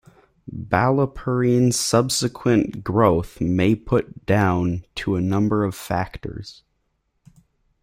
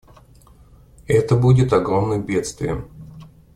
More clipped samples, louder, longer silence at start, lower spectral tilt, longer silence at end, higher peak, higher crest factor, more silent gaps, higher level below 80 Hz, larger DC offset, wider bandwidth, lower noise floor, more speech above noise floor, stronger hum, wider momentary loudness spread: neither; about the same, -21 LUFS vs -19 LUFS; second, 0.45 s vs 1.1 s; second, -5.5 dB/octave vs -7.5 dB/octave; first, 1.3 s vs 0.3 s; about the same, -2 dBFS vs -2 dBFS; about the same, 18 dB vs 18 dB; neither; about the same, -46 dBFS vs -42 dBFS; neither; first, 16 kHz vs 11.5 kHz; first, -71 dBFS vs -48 dBFS; first, 51 dB vs 31 dB; neither; second, 12 LU vs 15 LU